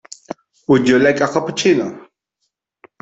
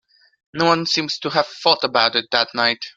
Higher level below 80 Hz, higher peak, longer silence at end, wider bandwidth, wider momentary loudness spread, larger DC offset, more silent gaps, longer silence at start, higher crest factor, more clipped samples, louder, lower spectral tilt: first, -58 dBFS vs -64 dBFS; about the same, -2 dBFS vs 0 dBFS; first, 1 s vs 0.05 s; second, 8.2 kHz vs 12 kHz; first, 20 LU vs 5 LU; neither; neither; first, 0.7 s vs 0.55 s; about the same, 16 dB vs 20 dB; neither; first, -15 LUFS vs -18 LUFS; first, -5 dB/octave vs -3.5 dB/octave